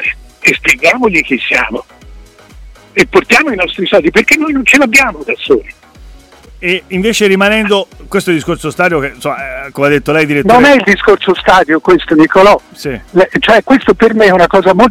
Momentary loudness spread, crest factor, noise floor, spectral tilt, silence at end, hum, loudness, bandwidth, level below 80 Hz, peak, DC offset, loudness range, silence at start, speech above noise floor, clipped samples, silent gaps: 11 LU; 10 dB; -36 dBFS; -4.5 dB/octave; 0 s; none; -9 LUFS; 17 kHz; -36 dBFS; 0 dBFS; under 0.1%; 4 LU; 0 s; 27 dB; 0.2%; none